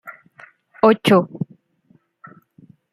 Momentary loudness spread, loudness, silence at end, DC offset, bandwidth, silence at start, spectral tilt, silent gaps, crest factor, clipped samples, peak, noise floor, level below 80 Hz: 17 LU; -16 LUFS; 1.5 s; under 0.1%; 15.5 kHz; 0.05 s; -6.5 dB/octave; none; 20 dB; under 0.1%; -2 dBFS; -59 dBFS; -64 dBFS